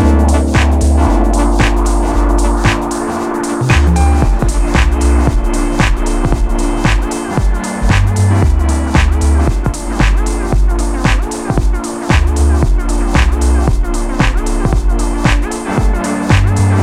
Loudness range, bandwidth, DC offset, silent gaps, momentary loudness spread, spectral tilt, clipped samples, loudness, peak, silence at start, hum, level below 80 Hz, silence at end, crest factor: 1 LU; 13 kHz; under 0.1%; none; 5 LU; -6 dB/octave; under 0.1%; -13 LUFS; 0 dBFS; 0 s; none; -12 dBFS; 0 s; 10 dB